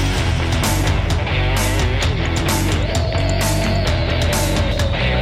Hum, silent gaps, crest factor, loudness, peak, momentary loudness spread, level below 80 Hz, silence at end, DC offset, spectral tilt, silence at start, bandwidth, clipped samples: none; none; 10 dB; -18 LUFS; -6 dBFS; 1 LU; -22 dBFS; 0 s; under 0.1%; -4.5 dB/octave; 0 s; 16 kHz; under 0.1%